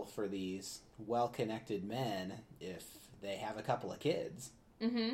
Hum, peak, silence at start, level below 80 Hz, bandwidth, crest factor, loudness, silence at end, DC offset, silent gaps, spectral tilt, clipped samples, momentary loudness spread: none; -20 dBFS; 0 s; -70 dBFS; 16 kHz; 20 dB; -41 LUFS; 0 s; under 0.1%; none; -5 dB/octave; under 0.1%; 12 LU